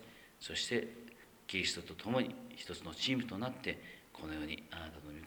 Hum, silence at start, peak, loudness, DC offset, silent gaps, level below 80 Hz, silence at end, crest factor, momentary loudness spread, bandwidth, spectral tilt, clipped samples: none; 0 s; -20 dBFS; -40 LUFS; under 0.1%; none; -64 dBFS; 0 s; 22 dB; 14 LU; over 20 kHz; -3.5 dB/octave; under 0.1%